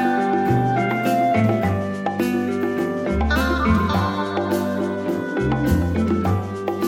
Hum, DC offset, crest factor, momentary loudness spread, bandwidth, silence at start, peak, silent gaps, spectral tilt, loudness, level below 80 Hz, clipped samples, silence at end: none; under 0.1%; 14 dB; 5 LU; 17 kHz; 0 s; -6 dBFS; none; -7 dB/octave; -21 LUFS; -34 dBFS; under 0.1%; 0 s